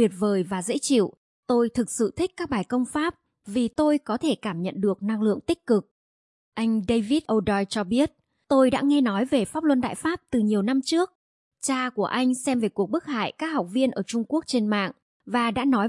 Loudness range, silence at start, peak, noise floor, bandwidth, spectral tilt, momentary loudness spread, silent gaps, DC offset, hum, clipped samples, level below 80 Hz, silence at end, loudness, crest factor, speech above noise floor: 3 LU; 0 s; -8 dBFS; under -90 dBFS; 11.5 kHz; -5 dB/octave; 6 LU; 1.17-1.43 s, 5.91-6.52 s, 11.15-11.51 s, 15.02-15.20 s; under 0.1%; none; under 0.1%; -58 dBFS; 0 s; -25 LUFS; 16 dB; over 66 dB